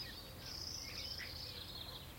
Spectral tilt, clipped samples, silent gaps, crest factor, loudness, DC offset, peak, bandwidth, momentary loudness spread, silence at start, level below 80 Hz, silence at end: -2.5 dB/octave; under 0.1%; none; 16 dB; -46 LUFS; under 0.1%; -32 dBFS; 16.5 kHz; 4 LU; 0 s; -60 dBFS; 0 s